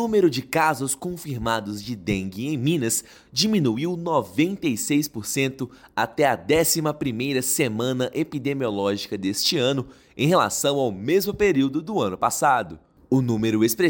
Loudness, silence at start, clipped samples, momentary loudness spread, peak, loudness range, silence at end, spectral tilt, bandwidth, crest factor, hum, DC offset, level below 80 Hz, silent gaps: -23 LUFS; 0 s; under 0.1%; 7 LU; -6 dBFS; 2 LU; 0 s; -4.5 dB/octave; 17 kHz; 16 dB; none; under 0.1%; -52 dBFS; none